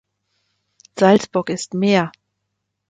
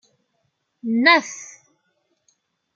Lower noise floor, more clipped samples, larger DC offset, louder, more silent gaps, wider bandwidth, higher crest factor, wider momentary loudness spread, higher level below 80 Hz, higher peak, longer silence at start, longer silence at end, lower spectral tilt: first, -76 dBFS vs -72 dBFS; neither; neither; about the same, -18 LUFS vs -17 LUFS; neither; first, 9.4 kHz vs 7.4 kHz; second, 18 dB vs 24 dB; second, 12 LU vs 22 LU; first, -62 dBFS vs -80 dBFS; about the same, -2 dBFS vs 0 dBFS; about the same, 0.95 s vs 0.85 s; second, 0.8 s vs 1.3 s; first, -5.5 dB/octave vs -2.5 dB/octave